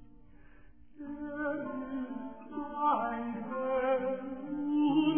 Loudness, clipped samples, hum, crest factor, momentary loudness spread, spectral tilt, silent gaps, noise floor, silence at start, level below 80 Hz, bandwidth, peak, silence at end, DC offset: -34 LUFS; under 0.1%; none; 16 dB; 12 LU; -2 dB/octave; none; -58 dBFS; 0 s; -62 dBFS; 3.3 kHz; -16 dBFS; 0 s; 0.2%